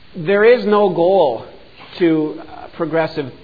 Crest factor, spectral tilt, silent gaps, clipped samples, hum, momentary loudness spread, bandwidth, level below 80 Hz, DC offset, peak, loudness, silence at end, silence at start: 14 dB; -9 dB/octave; none; under 0.1%; none; 17 LU; 5 kHz; -54 dBFS; 0.7%; -2 dBFS; -15 LUFS; 0.1 s; 0.15 s